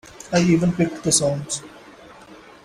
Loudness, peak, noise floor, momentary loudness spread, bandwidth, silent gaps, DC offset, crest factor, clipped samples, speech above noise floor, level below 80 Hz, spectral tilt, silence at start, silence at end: -20 LUFS; -2 dBFS; -45 dBFS; 10 LU; 14.5 kHz; none; under 0.1%; 20 dB; under 0.1%; 25 dB; -52 dBFS; -4.5 dB/octave; 0.05 s; 0.3 s